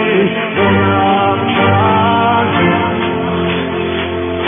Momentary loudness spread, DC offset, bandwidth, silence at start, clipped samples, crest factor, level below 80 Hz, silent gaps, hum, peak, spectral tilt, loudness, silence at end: 6 LU; under 0.1%; 3.7 kHz; 0 s; under 0.1%; 12 dB; -42 dBFS; none; none; 0 dBFS; -4 dB/octave; -13 LUFS; 0 s